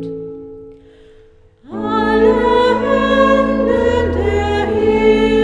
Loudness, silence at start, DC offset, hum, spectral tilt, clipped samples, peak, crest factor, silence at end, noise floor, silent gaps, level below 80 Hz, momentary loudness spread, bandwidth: -14 LUFS; 0 s; under 0.1%; none; -6.5 dB/octave; under 0.1%; 0 dBFS; 14 dB; 0 s; -46 dBFS; none; -32 dBFS; 16 LU; 10 kHz